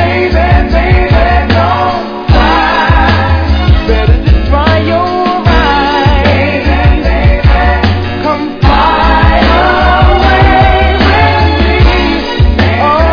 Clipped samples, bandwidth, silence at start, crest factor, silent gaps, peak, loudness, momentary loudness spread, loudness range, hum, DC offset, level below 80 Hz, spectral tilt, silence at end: 2%; 5.4 kHz; 0 s; 6 dB; none; 0 dBFS; -8 LUFS; 4 LU; 2 LU; none; under 0.1%; -12 dBFS; -7.5 dB/octave; 0 s